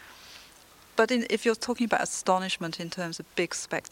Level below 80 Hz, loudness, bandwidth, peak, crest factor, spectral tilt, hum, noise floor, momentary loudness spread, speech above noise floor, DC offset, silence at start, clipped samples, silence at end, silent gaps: -68 dBFS; -28 LUFS; 17 kHz; -8 dBFS; 22 dB; -3.5 dB/octave; none; -54 dBFS; 17 LU; 26 dB; under 0.1%; 0 s; under 0.1%; 0.1 s; none